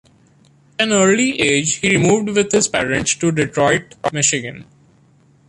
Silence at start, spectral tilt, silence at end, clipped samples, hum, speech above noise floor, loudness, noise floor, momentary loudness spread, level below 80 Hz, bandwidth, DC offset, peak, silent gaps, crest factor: 0.8 s; -3.5 dB/octave; 0.85 s; under 0.1%; none; 36 dB; -16 LUFS; -52 dBFS; 7 LU; -50 dBFS; 11.5 kHz; under 0.1%; -2 dBFS; none; 16 dB